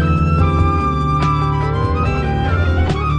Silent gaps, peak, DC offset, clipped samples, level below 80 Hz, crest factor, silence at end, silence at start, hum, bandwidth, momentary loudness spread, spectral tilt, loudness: none; -2 dBFS; under 0.1%; under 0.1%; -22 dBFS; 12 dB; 0 s; 0 s; none; 8.4 kHz; 3 LU; -8 dB/octave; -16 LUFS